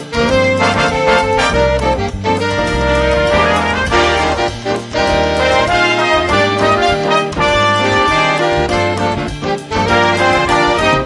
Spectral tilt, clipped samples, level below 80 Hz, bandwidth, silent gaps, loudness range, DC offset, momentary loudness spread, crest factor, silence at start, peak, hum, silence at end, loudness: -4.5 dB/octave; under 0.1%; -28 dBFS; 11.5 kHz; none; 1 LU; under 0.1%; 5 LU; 12 dB; 0 s; 0 dBFS; none; 0 s; -13 LUFS